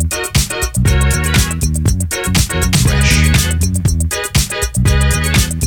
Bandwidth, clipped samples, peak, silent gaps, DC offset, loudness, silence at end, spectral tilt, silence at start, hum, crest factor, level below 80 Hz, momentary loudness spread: over 20 kHz; under 0.1%; 0 dBFS; none; under 0.1%; -14 LUFS; 0 s; -4 dB/octave; 0 s; none; 12 dB; -18 dBFS; 5 LU